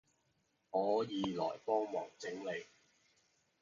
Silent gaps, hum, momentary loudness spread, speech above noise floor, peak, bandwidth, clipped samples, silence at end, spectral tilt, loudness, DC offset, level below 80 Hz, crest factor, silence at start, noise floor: none; none; 9 LU; 42 dB; -22 dBFS; 7.2 kHz; under 0.1%; 0.95 s; -4 dB/octave; -39 LUFS; under 0.1%; -78 dBFS; 20 dB; 0.75 s; -79 dBFS